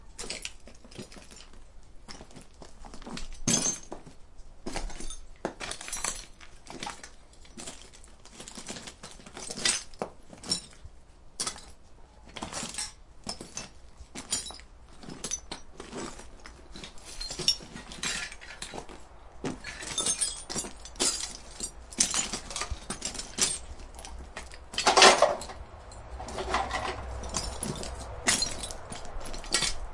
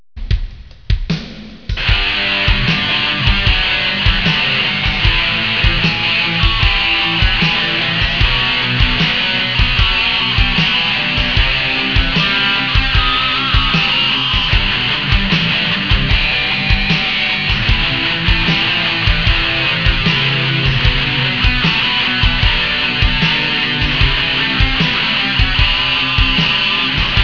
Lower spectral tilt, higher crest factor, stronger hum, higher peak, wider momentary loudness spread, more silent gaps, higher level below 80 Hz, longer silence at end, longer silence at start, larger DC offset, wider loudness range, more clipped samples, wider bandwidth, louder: second, -1.5 dB/octave vs -5 dB/octave; first, 32 dB vs 14 dB; neither; about the same, -2 dBFS vs 0 dBFS; first, 21 LU vs 2 LU; neither; second, -46 dBFS vs -22 dBFS; about the same, 0 s vs 0 s; second, 0 s vs 0.15 s; second, under 0.1% vs 0.8%; first, 13 LU vs 1 LU; neither; first, 11.5 kHz vs 5.4 kHz; second, -30 LUFS vs -13 LUFS